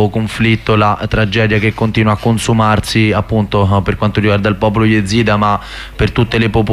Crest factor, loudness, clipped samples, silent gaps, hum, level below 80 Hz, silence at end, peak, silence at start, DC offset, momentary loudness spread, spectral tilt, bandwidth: 12 dB; -13 LUFS; under 0.1%; none; none; -30 dBFS; 0 s; 0 dBFS; 0 s; under 0.1%; 3 LU; -6.5 dB/octave; 13 kHz